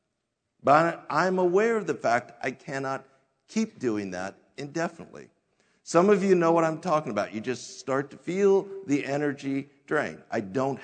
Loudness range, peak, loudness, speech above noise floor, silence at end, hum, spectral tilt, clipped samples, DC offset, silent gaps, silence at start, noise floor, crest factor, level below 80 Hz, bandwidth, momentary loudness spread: 7 LU; -6 dBFS; -27 LUFS; 54 dB; 0 s; none; -6 dB/octave; under 0.1%; under 0.1%; none; 0.65 s; -80 dBFS; 22 dB; -74 dBFS; 9.4 kHz; 13 LU